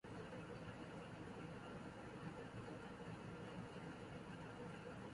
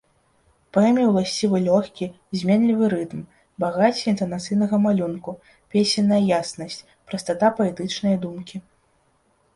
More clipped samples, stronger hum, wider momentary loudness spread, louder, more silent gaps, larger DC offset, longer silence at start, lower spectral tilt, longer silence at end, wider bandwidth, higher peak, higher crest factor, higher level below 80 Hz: neither; neither; second, 1 LU vs 16 LU; second, -54 LUFS vs -21 LUFS; neither; neither; second, 0.05 s vs 0.75 s; about the same, -6.5 dB/octave vs -6 dB/octave; second, 0 s vs 0.95 s; about the same, 11.5 kHz vs 11.5 kHz; second, -38 dBFS vs -6 dBFS; about the same, 14 dB vs 16 dB; second, -70 dBFS vs -60 dBFS